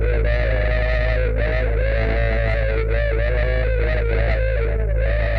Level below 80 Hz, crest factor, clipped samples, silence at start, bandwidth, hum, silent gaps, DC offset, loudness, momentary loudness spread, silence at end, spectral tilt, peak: -20 dBFS; 12 dB; under 0.1%; 0 s; 5 kHz; none; none; under 0.1%; -21 LUFS; 1 LU; 0 s; -8.5 dB/octave; -6 dBFS